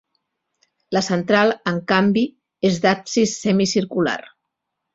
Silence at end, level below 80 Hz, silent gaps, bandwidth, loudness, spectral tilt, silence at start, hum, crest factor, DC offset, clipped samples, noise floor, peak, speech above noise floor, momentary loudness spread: 0.75 s; -58 dBFS; none; 7.8 kHz; -19 LUFS; -5 dB/octave; 0.9 s; none; 18 dB; under 0.1%; under 0.1%; -79 dBFS; -2 dBFS; 60 dB; 7 LU